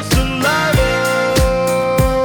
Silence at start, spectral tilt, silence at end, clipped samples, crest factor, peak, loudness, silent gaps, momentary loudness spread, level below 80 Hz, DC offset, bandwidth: 0 s; -5 dB/octave; 0 s; under 0.1%; 10 dB; -4 dBFS; -15 LUFS; none; 2 LU; -22 dBFS; under 0.1%; over 20 kHz